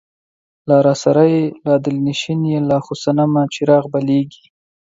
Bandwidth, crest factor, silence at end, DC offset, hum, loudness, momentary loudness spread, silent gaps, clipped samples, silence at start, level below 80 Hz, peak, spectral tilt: 7.8 kHz; 16 dB; 0.55 s; under 0.1%; none; -16 LUFS; 6 LU; none; under 0.1%; 0.65 s; -58 dBFS; 0 dBFS; -7 dB/octave